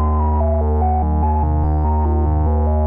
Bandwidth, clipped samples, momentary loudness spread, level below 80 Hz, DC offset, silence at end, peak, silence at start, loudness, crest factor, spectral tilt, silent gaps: 2.3 kHz; under 0.1%; 0 LU; -18 dBFS; under 0.1%; 0 s; -8 dBFS; 0 s; -18 LUFS; 6 dB; -14 dB/octave; none